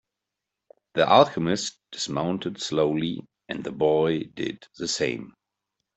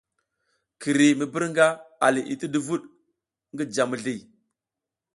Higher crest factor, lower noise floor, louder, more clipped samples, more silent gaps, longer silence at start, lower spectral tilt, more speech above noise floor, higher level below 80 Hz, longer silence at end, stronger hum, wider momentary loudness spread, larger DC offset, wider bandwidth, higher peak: about the same, 22 dB vs 22 dB; about the same, -86 dBFS vs -88 dBFS; about the same, -25 LUFS vs -24 LUFS; neither; neither; first, 0.95 s vs 0.8 s; about the same, -4.5 dB/octave vs -4.5 dB/octave; second, 61 dB vs 65 dB; first, -62 dBFS vs -72 dBFS; second, 0.65 s vs 0.95 s; neither; about the same, 15 LU vs 13 LU; neither; second, 8.4 kHz vs 11.5 kHz; about the same, -4 dBFS vs -4 dBFS